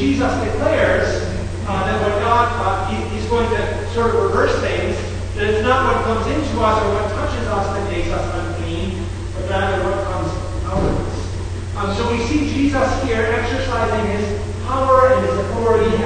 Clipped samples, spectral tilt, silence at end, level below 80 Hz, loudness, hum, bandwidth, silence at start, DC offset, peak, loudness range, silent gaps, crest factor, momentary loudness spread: under 0.1%; -6 dB/octave; 0 s; -28 dBFS; -19 LUFS; none; 9.6 kHz; 0 s; under 0.1%; 0 dBFS; 4 LU; none; 16 dB; 8 LU